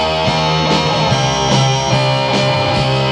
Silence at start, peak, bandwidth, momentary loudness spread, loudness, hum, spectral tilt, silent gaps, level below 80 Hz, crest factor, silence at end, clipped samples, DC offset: 0 s; 0 dBFS; 10.5 kHz; 1 LU; -14 LUFS; none; -4.5 dB/octave; none; -36 dBFS; 12 dB; 0 s; under 0.1%; under 0.1%